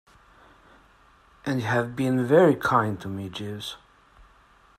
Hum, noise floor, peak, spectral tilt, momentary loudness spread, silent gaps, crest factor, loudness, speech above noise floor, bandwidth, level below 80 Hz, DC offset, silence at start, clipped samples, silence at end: none; -57 dBFS; -6 dBFS; -6.5 dB/octave; 17 LU; none; 20 dB; -24 LUFS; 34 dB; 15 kHz; -60 dBFS; under 0.1%; 1.45 s; under 0.1%; 1.05 s